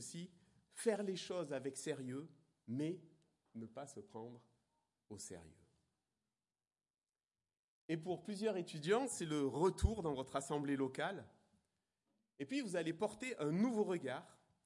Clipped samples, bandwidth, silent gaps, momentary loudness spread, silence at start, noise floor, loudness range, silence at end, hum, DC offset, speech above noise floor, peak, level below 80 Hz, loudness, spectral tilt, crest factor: under 0.1%; 11.5 kHz; 6.90-6.94 s, 7.59-7.89 s; 16 LU; 0 s; under -90 dBFS; 17 LU; 0.35 s; none; under 0.1%; over 49 dB; -22 dBFS; -58 dBFS; -42 LUFS; -5.5 dB/octave; 22 dB